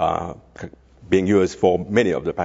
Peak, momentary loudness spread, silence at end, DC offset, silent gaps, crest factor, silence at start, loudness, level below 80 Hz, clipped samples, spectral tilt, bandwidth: -2 dBFS; 21 LU; 0 s; under 0.1%; none; 18 dB; 0 s; -20 LUFS; -48 dBFS; under 0.1%; -6.5 dB/octave; 7.8 kHz